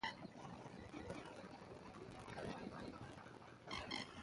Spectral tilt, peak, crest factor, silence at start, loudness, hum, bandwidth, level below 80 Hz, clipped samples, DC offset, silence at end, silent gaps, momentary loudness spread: -4.5 dB/octave; -30 dBFS; 22 dB; 0 s; -52 LUFS; none; 11.5 kHz; -70 dBFS; under 0.1%; under 0.1%; 0 s; none; 9 LU